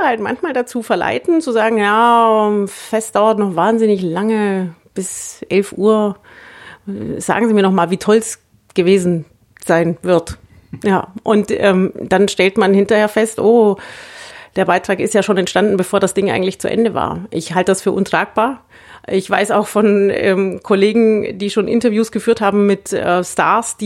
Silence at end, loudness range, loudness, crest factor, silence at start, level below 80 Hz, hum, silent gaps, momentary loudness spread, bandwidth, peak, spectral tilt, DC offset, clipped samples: 0 s; 3 LU; -15 LUFS; 14 dB; 0 s; -52 dBFS; none; none; 11 LU; 13.5 kHz; 0 dBFS; -5 dB/octave; under 0.1%; under 0.1%